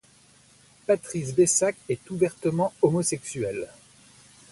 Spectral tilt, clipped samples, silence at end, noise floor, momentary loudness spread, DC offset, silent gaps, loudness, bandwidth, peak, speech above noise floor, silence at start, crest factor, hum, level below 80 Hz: -5 dB/octave; under 0.1%; 0.85 s; -57 dBFS; 12 LU; under 0.1%; none; -25 LUFS; 11.5 kHz; -8 dBFS; 32 dB; 0.9 s; 20 dB; none; -62 dBFS